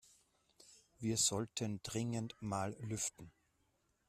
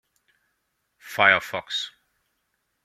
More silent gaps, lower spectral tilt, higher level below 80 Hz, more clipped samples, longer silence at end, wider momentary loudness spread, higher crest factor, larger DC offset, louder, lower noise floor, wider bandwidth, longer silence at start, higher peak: neither; about the same, -3.5 dB/octave vs -2.5 dB/octave; about the same, -70 dBFS vs -72 dBFS; neither; second, 0.8 s vs 0.95 s; second, 9 LU vs 16 LU; about the same, 22 dB vs 26 dB; neither; second, -39 LUFS vs -21 LUFS; first, -79 dBFS vs -75 dBFS; second, 14 kHz vs 16 kHz; second, 0.7 s vs 1.05 s; second, -22 dBFS vs -2 dBFS